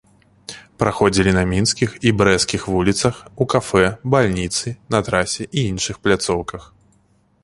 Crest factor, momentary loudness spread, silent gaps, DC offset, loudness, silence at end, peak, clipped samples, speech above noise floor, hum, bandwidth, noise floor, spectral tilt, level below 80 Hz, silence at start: 18 dB; 9 LU; none; under 0.1%; -18 LUFS; 0.8 s; -2 dBFS; under 0.1%; 40 dB; none; 11.5 kHz; -59 dBFS; -4.5 dB/octave; -38 dBFS; 0.5 s